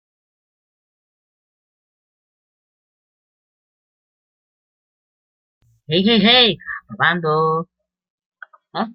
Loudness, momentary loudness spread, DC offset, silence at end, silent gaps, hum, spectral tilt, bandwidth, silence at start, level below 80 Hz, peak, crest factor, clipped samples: -15 LUFS; 18 LU; under 0.1%; 0 s; 8.10-8.18 s, 8.26-8.32 s; none; -8.5 dB/octave; 5.8 kHz; 5.9 s; -58 dBFS; -2 dBFS; 22 dB; under 0.1%